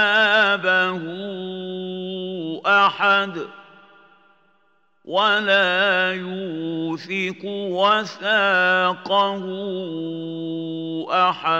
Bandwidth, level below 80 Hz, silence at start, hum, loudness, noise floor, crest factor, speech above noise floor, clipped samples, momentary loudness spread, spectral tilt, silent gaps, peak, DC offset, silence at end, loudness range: 8.2 kHz; -82 dBFS; 0 s; none; -20 LUFS; -64 dBFS; 18 dB; 43 dB; under 0.1%; 13 LU; -5 dB/octave; none; -4 dBFS; under 0.1%; 0 s; 2 LU